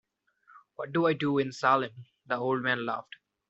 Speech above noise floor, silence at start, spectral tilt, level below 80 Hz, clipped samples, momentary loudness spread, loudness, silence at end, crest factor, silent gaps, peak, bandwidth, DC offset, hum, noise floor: 35 dB; 0.8 s; -4 dB/octave; -74 dBFS; under 0.1%; 13 LU; -29 LUFS; 0.5 s; 20 dB; none; -10 dBFS; 8 kHz; under 0.1%; none; -64 dBFS